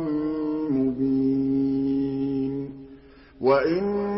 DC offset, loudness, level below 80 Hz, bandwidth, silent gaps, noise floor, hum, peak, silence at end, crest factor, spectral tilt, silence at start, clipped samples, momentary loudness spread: under 0.1%; -24 LUFS; -52 dBFS; 5.8 kHz; none; -48 dBFS; none; -8 dBFS; 0 s; 16 dB; -12 dB/octave; 0 s; under 0.1%; 7 LU